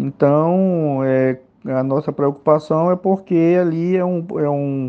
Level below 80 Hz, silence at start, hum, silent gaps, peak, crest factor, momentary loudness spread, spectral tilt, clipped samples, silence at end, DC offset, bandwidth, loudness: -64 dBFS; 0 s; none; none; 0 dBFS; 16 dB; 6 LU; -10.5 dB/octave; under 0.1%; 0 s; under 0.1%; 6.6 kHz; -17 LUFS